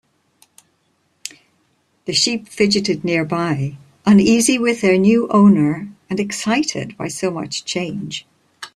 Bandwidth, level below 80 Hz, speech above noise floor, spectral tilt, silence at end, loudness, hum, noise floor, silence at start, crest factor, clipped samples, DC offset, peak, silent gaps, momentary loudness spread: 13 kHz; -56 dBFS; 48 dB; -4.5 dB/octave; 0.1 s; -17 LUFS; none; -64 dBFS; 1.25 s; 16 dB; under 0.1%; under 0.1%; -2 dBFS; none; 17 LU